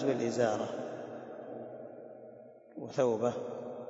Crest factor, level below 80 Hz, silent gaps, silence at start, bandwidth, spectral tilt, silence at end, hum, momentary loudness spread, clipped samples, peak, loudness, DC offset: 20 dB; -82 dBFS; none; 0 s; 8 kHz; -6 dB/octave; 0 s; none; 20 LU; under 0.1%; -16 dBFS; -35 LUFS; under 0.1%